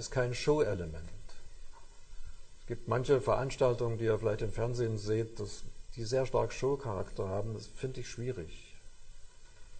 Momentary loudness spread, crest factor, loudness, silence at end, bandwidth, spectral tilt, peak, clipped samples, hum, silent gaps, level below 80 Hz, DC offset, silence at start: 18 LU; 18 dB; -34 LUFS; 0 s; 9.2 kHz; -6 dB/octave; -16 dBFS; under 0.1%; none; none; -46 dBFS; under 0.1%; 0 s